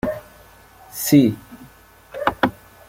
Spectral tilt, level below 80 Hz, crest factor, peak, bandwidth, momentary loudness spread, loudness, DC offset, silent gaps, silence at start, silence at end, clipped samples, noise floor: -5.5 dB/octave; -50 dBFS; 20 dB; -2 dBFS; 16.5 kHz; 20 LU; -19 LUFS; under 0.1%; none; 0.05 s; 0.35 s; under 0.1%; -48 dBFS